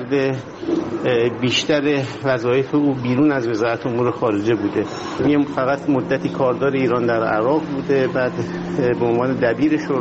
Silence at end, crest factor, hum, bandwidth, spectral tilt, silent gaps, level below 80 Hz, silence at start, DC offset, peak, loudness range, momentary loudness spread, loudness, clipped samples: 0 s; 16 dB; none; 8 kHz; -5 dB/octave; none; -52 dBFS; 0 s; under 0.1%; -4 dBFS; 1 LU; 5 LU; -19 LUFS; under 0.1%